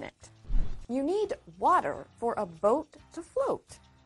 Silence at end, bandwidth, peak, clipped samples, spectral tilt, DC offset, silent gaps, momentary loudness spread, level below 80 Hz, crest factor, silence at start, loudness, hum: 0.3 s; 11.5 kHz; -14 dBFS; under 0.1%; -6 dB/octave; under 0.1%; none; 13 LU; -38 dBFS; 16 dB; 0 s; -31 LUFS; none